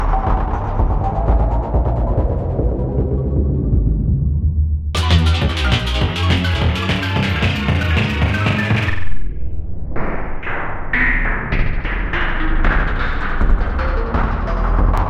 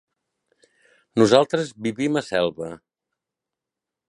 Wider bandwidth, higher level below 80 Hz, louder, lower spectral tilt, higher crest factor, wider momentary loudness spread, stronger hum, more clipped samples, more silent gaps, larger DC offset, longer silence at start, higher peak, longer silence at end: about the same, 11 kHz vs 11.5 kHz; first, -18 dBFS vs -64 dBFS; about the same, -19 LUFS vs -21 LUFS; first, -6.5 dB/octave vs -5 dB/octave; second, 14 dB vs 24 dB; second, 8 LU vs 13 LU; neither; neither; neither; neither; second, 0 s vs 1.15 s; about the same, -2 dBFS vs 0 dBFS; second, 0 s vs 1.3 s